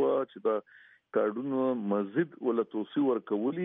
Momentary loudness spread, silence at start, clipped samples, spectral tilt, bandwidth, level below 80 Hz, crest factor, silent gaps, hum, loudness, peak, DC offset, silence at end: 3 LU; 0 s; under 0.1%; -6.5 dB/octave; 3.9 kHz; -86 dBFS; 14 dB; none; none; -31 LUFS; -16 dBFS; under 0.1%; 0 s